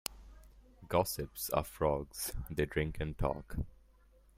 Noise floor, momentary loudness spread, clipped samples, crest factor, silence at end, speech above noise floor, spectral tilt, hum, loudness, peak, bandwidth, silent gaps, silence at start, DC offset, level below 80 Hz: -64 dBFS; 10 LU; under 0.1%; 22 dB; 0.6 s; 28 dB; -5 dB/octave; none; -37 LUFS; -14 dBFS; 16 kHz; none; 0.1 s; under 0.1%; -48 dBFS